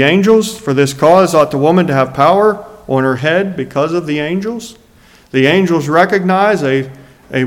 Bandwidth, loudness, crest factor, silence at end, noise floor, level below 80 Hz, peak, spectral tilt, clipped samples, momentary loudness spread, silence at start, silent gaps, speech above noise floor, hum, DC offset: 16.5 kHz; -12 LUFS; 12 dB; 0 s; -45 dBFS; -50 dBFS; 0 dBFS; -6 dB/octave; 0.2%; 10 LU; 0 s; none; 33 dB; none; under 0.1%